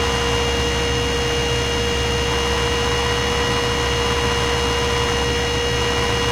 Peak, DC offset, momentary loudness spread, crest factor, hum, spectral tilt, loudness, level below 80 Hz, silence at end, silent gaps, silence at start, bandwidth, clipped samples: -8 dBFS; under 0.1%; 1 LU; 12 dB; none; -3.5 dB/octave; -19 LUFS; -28 dBFS; 0 s; none; 0 s; 16 kHz; under 0.1%